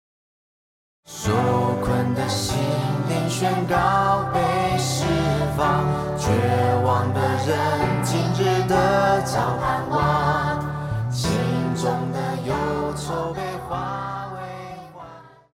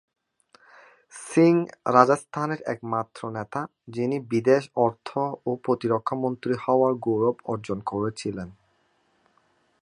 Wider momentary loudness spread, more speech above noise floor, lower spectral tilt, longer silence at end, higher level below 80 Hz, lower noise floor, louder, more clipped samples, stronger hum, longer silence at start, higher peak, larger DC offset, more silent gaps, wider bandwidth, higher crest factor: second, 9 LU vs 14 LU; second, 23 dB vs 43 dB; second, -5.5 dB/octave vs -7 dB/octave; second, 0.25 s vs 1.3 s; first, -42 dBFS vs -64 dBFS; second, -43 dBFS vs -67 dBFS; first, -22 LUFS vs -25 LUFS; neither; neither; about the same, 1.1 s vs 1.15 s; second, -6 dBFS vs -2 dBFS; neither; neither; first, 16.5 kHz vs 11.5 kHz; second, 16 dB vs 24 dB